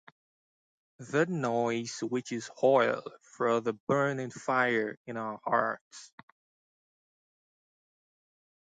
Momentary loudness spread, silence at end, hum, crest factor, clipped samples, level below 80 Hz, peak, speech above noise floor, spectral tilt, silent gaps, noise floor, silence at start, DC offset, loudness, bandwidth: 12 LU; 2.55 s; none; 20 dB; under 0.1%; -78 dBFS; -12 dBFS; over 60 dB; -5.5 dB/octave; 3.80-3.87 s, 4.97-5.05 s, 5.81-5.91 s; under -90 dBFS; 1 s; under 0.1%; -30 LUFS; 9.4 kHz